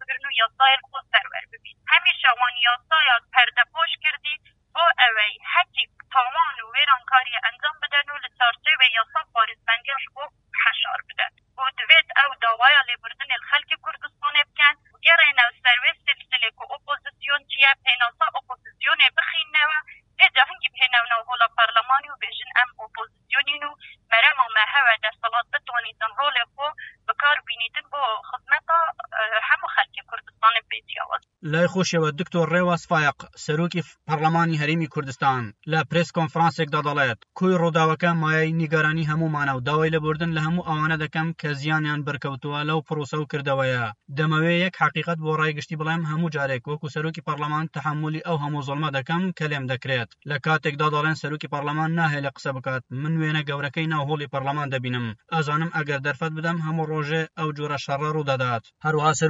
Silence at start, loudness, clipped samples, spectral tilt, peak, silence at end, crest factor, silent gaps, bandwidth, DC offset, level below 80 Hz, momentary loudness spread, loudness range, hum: 0 s; -21 LUFS; under 0.1%; -4.5 dB/octave; 0 dBFS; 0 s; 22 dB; none; 7.8 kHz; under 0.1%; -64 dBFS; 12 LU; 7 LU; none